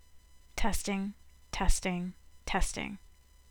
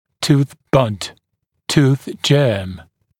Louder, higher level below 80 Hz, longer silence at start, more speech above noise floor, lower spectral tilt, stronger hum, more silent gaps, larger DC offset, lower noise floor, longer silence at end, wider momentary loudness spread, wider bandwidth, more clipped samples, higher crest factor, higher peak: second, -35 LUFS vs -17 LUFS; first, -38 dBFS vs -48 dBFS; about the same, 0.15 s vs 0.2 s; second, 26 dB vs 57 dB; second, -4 dB/octave vs -6 dB/octave; neither; neither; neither; second, -56 dBFS vs -73 dBFS; first, 0.55 s vs 0.4 s; second, 11 LU vs 16 LU; first, 19 kHz vs 15 kHz; neither; about the same, 22 dB vs 18 dB; second, -12 dBFS vs 0 dBFS